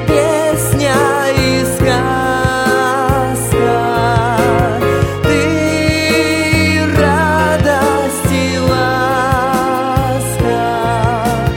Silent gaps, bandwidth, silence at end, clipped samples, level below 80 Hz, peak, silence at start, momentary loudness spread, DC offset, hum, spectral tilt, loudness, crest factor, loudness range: none; 17 kHz; 0 s; under 0.1%; -28 dBFS; 0 dBFS; 0 s; 3 LU; under 0.1%; none; -5 dB/octave; -13 LUFS; 12 dB; 1 LU